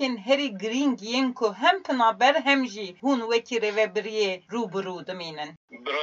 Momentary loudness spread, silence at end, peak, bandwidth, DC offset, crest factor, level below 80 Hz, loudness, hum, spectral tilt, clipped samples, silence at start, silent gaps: 13 LU; 0 s; -6 dBFS; 7.8 kHz; under 0.1%; 20 dB; -84 dBFS; -25 LUFS; none; -3.5 dB/octave; under 0.1%; 0 s; 5.57-5.68 s